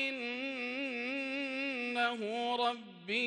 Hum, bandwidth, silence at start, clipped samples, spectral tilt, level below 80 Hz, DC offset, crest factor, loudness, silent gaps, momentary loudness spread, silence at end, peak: none; 11 kHz; 0 s; under 0.1%; -3.5 dB/octave; -86 dBFS; under 0.1%; 16 dB; -35 LUFS; none; 4 LU; 0 s; -20 dBFS